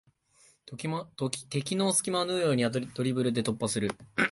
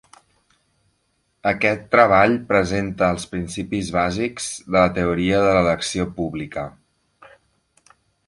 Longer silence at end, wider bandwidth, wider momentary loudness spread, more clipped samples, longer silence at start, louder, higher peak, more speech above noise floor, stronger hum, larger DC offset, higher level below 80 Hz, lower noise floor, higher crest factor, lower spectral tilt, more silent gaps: second, 0 s vs 1.6 s; about the same, 12 kHz vs 11.5 kHz; second, 9 LU vs 12 LU; neither; second, 0.65 s vs 1.45 s; second, -30 LUFS vs -20 LUFS; second, -8 dBFS vs -2 dBFS; second, 34 dB vs 49 dB; neither; neither; second, -66 dBFS vs -44 dBFS; second, -64 dBFS vs -68 dBFS; about the same, 22 dB vs 20 dB; about the same, -4 dB/octave vs -5 dB/octave; neither